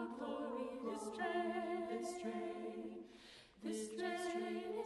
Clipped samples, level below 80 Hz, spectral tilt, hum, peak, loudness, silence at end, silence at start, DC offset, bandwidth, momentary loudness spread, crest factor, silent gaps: under 0.1%; -78 dBFS; -4 dB/octave; none; -30 dBFS; -44 LUFS; 0 s; 0 s; under 0.1%; 12 kHz; 11 LU; 14 dB; none